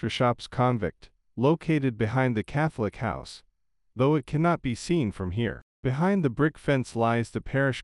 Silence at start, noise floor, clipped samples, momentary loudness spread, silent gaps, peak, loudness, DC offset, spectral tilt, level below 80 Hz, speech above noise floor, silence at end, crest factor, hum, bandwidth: 0 s; -72 dBFS; under 0.1%; 8 LU; 5.62-5.83 s; -10 dBFS; -27 LUFS; under 0.1%; -7 dB/octave; -50 dBFS; 46 dB; 0 s; 16 dB; none; 11.5 kHz